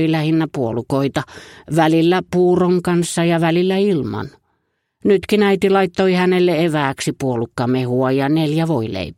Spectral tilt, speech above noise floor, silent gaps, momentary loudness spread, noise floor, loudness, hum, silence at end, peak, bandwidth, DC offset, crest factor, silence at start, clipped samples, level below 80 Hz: -6.5 dB/octave; 53 dB; none; 7 LU; -69 dBFS; -17 LUFS; none; 0.05 s; -2 dBFS; 15.5 kHz; under 0.1%; 16 dB; 0 s; under 0.1%; -52 dBFS